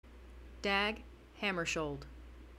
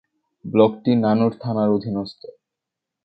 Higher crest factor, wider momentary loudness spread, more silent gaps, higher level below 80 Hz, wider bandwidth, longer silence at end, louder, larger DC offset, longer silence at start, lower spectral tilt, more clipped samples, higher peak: about the same, 22 dB vs 20 dB; first, 23 LU vs 12 LU; neither; first, -54 dBFS vs -60 dBFS; first, 16 kHz vs 5 kHz; second, 0 s vs 0.95 s; second, -36 LUFS vs -20 LUFS; neither; second, 0.05 s vs 0.45 s; second, -3.5 dB/octave vs -10 dB/octave; neither; second, -18 dBFS vs -2 dBFS